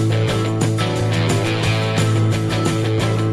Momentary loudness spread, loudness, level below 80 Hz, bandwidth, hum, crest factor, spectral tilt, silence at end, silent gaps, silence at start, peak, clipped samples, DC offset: 2 LU; -18 LUFS; -40 dBFS; 13 kHz; none; 12 dB; -6 dB/octave; 0 s; none; 0 s; -6 dBFS; under 0.1%; 0.7%